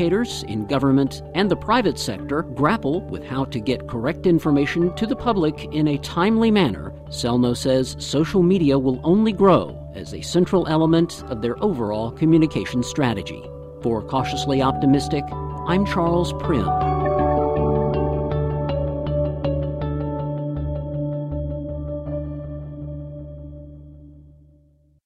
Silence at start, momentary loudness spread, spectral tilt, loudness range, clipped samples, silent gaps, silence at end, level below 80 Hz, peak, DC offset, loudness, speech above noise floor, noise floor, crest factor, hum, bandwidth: 0 s; 12 LU; -6.5 dB/octave; 8 LU; under 0.1%; none; 0.8 s; -38 dBFS; -4 dBFS; under 0.1%; -21 LUFS; 37 dB; -57 dBFS; 16 dB; none; 14.5 kHz